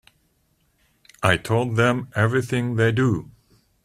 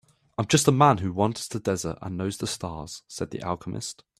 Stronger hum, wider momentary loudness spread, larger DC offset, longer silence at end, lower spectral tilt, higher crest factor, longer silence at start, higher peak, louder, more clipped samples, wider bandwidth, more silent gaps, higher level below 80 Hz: neither; second, 4 LU vs 15 LU; neither; first, 0.6 s vs 0.25 s; first, -6.5 dB/octave vs -5 dB/octave; about the same, 22 dB vs 22 dB; first, 1.2 s vs 0.4 s; first, 0 dBFS vs -4 dBFS; first, -21 LUFS vs -26 LUFS; neither; about the same, 14.5 kHz vs 14.5 kHz; neither; about the same, -52 dBFS vs -56 dBFS